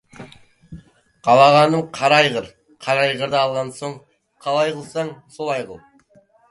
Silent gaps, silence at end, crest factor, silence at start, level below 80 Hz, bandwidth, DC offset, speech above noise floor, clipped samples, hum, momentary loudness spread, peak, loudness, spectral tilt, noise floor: none; 0.75 s; 20 dB; 0.2 s; -60 dBFS; 11.5 kHz; under 0.1%; 37 dB; under 0.1%; none; 19 LU; 0 dBFS; -18 LUFS; -4.5 dB/octave; -55 dBFS